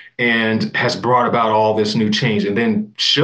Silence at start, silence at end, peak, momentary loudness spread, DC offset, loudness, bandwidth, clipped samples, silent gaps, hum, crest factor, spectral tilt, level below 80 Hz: 0.2 s; 0 s; -4 dBFS; 3 LU; under 0.1%; -16 LUFS; 9.4 kHz; under 0.1%; none; none; 14 dB; -5 dB/octave; -64 dBFS